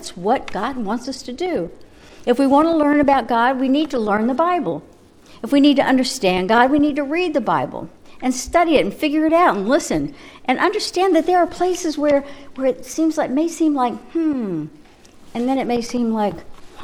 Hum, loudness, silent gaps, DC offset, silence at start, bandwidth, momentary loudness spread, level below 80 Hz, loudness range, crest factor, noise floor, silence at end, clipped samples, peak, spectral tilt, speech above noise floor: none; -18 LUFS; none; under 0.1%; 0 s; 14.5 kHz; 12 LU; -46 dBFS; 4 LU; 18 dB; -45 dBFS; 0 s; under 0.1%; 0 dBFS; -4.5 dB/octave; 27 dB